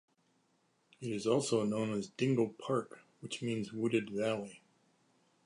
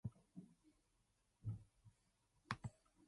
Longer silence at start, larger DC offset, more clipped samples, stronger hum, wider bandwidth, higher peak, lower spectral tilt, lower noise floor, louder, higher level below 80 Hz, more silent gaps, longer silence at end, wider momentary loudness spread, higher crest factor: first, 1 s vs 0.05 s; neither; neither; neither; about the same, 11.5 kHz vs 11 kHz; first, -18 dBFS vs -26 dBFS; about the same, -5.5 dB/octave vs -6 dB/octave; second, -75 dBFS vs -83 dBFS; first, -35 LUFS vs -54 LUFS; second, -78 dBFS vs -72 dBFS; neither; first, 0.9 s vs 0 s; about the same, 13 LU vs 12 LU; second, 18 dB vs 30 dB